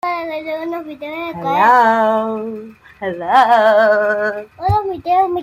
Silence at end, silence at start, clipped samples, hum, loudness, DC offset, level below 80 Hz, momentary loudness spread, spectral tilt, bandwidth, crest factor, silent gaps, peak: 0 s; 0.05 s; under 0.1%; none; -15 LUFS; under 0.1%; -46 dBFS; 15 LU; -6.5 dB/octave; 16 kHz; 14 dB; none; -2 dBFS